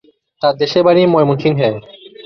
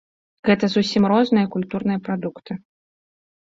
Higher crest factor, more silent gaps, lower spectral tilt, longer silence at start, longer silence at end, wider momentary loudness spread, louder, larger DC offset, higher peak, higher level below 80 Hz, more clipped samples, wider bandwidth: about the same, 14 dB vs 18 dB; neither; about the same, -7.5 dB/octave vs -6.5 dB/octave; about the same, 0.4 s vs 0.45 s; second, 0.05 s vs 0.85 s; second, 8 LU vs 15 LU; first, -13 LUFS vs -20 LUFS; neither; about the same, -2 dBFS vs -4 dBFS; first, -54 dBFS vs -60 dBFS; neither; second, 6.6 kHz vs 7.6 kHz